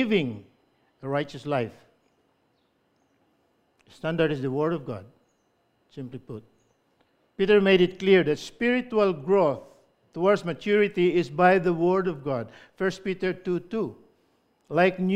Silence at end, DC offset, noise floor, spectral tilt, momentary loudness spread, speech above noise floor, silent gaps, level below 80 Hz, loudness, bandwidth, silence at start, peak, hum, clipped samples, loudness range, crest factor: 0 s; under 0.1%; -69 dBFS; -7 dB/octave; 19 LU; 45 dB; none; -60 dBFS; -25 LUFS; 9 kHz; 0 s; -6 dBFS; none; under 0.1%; 11 LU; 20 dB